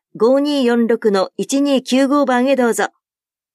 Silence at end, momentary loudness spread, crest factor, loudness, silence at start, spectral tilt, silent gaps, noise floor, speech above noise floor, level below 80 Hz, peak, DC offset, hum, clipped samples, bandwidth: 0.65 s; 5 LU; 12 dB; -16 LUFS; 0.15 s; -4 dB/octave; none; under -90 dBFS; over 75 dB; -70 dBFS; -4 dBFS; under 0.1%; none; under 0.1%; 14 kHz